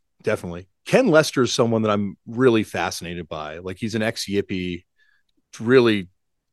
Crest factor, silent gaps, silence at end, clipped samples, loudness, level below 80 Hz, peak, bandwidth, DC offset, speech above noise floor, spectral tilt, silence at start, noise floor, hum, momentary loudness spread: 22 dB; none; 0.45 s; under 0.1%; -21 LUFS; -58 dBFS; 0 dBFS; 12.5 kHz; under 0.1%; 44 dB; -5 dB/octave; 0.25 s; -65 dBFS; none; 15 LU